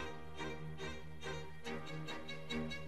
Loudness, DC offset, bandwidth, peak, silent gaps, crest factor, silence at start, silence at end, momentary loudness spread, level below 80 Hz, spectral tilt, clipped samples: -46 LUFS; 0.4%; 14.5 kHz; -28 dBFS; none; 16 dB; 0 s; 0 s; 5 LU; -60 dBFS; -5 dB/octave; under 0.1%